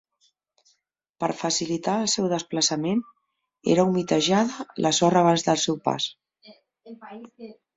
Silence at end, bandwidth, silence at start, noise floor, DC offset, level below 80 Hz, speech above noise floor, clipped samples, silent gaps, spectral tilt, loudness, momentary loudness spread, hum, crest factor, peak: 0.25 s; 8.2 kHz; 1.2 s; -73 dBFS; under 0.1%; -64 dBFS; 49 dB; under 0.1%; none; -4 dB/octave; -23 LUFS; 22 LU; none; 20 dB; -6 dBFS